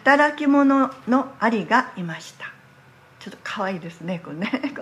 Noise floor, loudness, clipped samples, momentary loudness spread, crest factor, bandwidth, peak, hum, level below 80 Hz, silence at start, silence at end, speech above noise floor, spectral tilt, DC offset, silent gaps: -51 dBFS; -22 LUFS; under 0.1%; 20 LU; 20 dB; 10.5 kHz; -2 dBFS; none; -72 dBFS; 0.05 s; 0 s; 30 dB; -6 dB/octave; under 0.1%; none